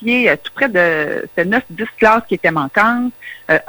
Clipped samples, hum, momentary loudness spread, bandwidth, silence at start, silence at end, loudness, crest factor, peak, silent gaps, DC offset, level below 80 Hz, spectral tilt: under 0.1%; none; 7 LU; over 20 kHz; 0 s; 0 s; -15 LUFS; 14 dB; -2 dBFS; none; under 0.1%; -52 dBFS; -6 dB/octave